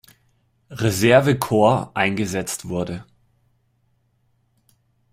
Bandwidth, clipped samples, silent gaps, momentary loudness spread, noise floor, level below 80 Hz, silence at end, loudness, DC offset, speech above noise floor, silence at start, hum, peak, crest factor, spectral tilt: 16 kHz; under 0.1%; none; 14 LU; -65 dBFS; -54 dBFS; 2.1 s; -19 LUFS; under 0.1%; 46 dB; 0.7 s; none; -2 dBFS; 20 dB; -5.5 dB/octave